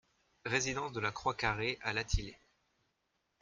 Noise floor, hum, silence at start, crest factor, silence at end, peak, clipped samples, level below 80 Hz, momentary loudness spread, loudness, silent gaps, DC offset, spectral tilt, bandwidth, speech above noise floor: -82 dBFS; none; 0.45 s; 22 dB; 1.05 s; -16 dBFS; under 0.1%; -48 dBFS; 5 LU; -36 LUFS; none; under 0.1%; -3.5 dB/octave; 10 kHz; 46 dB